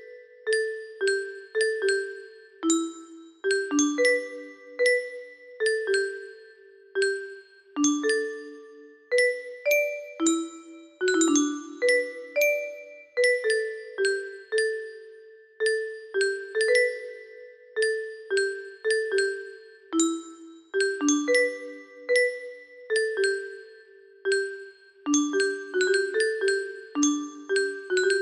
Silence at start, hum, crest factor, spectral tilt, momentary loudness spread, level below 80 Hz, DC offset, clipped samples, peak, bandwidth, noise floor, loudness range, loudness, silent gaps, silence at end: 0 s; none; 18 dB; -0.5 dB/octave; 18 LU; -74 dBFS; under 0.1%; under 0.1%; -10 dBFS; 13 kHz; -52 dBFS; 3 LU; -26 LUFS; none; 0 s